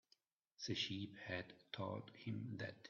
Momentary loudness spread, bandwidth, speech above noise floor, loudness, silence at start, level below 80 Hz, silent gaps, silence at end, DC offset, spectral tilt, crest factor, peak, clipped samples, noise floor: 7 LU; 7 kHz; 32 dB; -47 LUFS; 0.6 s; -82 dBFS; none; 0 s; under 0.1%; -3.5 dB/octave; 18 dB; -30 dBFS; under 0.1%; -80 dBFS